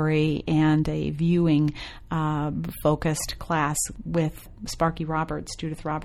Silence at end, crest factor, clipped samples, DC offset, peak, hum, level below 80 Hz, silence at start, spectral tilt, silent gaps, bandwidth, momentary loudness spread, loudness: 0 s; 16 dB; under 0.1%; under 0.1%; -10 dBFS; none; -42 dBFS; 0 s; -6 dB/octave; none; 16.5 kHz; 10 LU; -25 LUFS